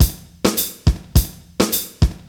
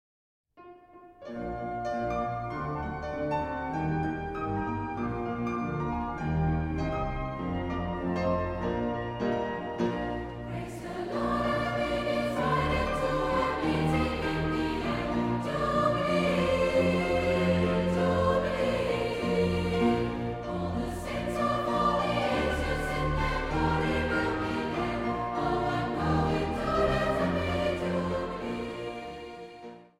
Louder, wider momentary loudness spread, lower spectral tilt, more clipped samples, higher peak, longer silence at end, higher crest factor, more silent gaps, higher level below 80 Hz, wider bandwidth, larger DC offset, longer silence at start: first, -20 LUFS vs -29 LUFS; second, 3 LU vs 8 LU; second, -4.5 dB/octave vs -6.5 dB/octave; neither; first, 0 dBFS vs -14 dBFS; about the same, 0.1 s vs 0.15 s; about the same, 18 dB vs 16 dB; neither; first, -24 dBFS vs -42 dBFS; first, over 20 kHz vs 15 kHz; neither; second, 0 s vs 0.6 s